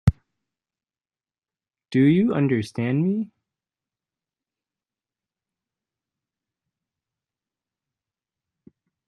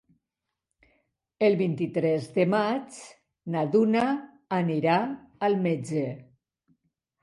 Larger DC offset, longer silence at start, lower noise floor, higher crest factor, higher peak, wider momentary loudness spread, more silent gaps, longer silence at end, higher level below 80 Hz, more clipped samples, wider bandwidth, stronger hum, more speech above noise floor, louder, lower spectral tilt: neither; second, 0.05 s vs 1.4 s; first, under -90 dBFS vs -86 dBFS; first, 26 dB vs 18 dB; first, -2 dBFS vs -10 dBFS; about the same, 9 LU vs 11 LU; neither; first, 5.8 s vs 1 s; first, -48 dBFS vs -72 dBFS; neither; about the same, 11 kHz vs 11.5 kHz; neither; first, over 70 dB vs 61 dB; first, -22 LUFS vs -26 LUFS; first, -8.5 dB/octave vs -7 dB/octave